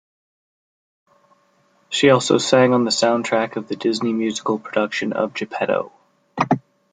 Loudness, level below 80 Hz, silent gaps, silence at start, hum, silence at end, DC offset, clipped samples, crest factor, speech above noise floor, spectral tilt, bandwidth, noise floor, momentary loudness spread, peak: -19 LUFS; -64 dBFS; none; 1.9 s; none; 0.35 s; under 0.1%; under 0.1%; 20 dB; 41 dB; -4.5 dB/octave; 9.6 kHz; -60 dBFS; 10 LU; 0 dBFS